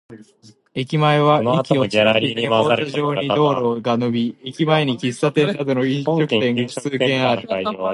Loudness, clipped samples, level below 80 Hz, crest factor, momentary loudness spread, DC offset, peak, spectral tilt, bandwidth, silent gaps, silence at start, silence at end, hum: -18 LUFS; under 0.1%; -60 dBFS; 18 dB; 7 LU; under 0.1%; -2 dBFS; -6 dB/octave; 11.5 kHz; none; 0.1 s; 0 s; none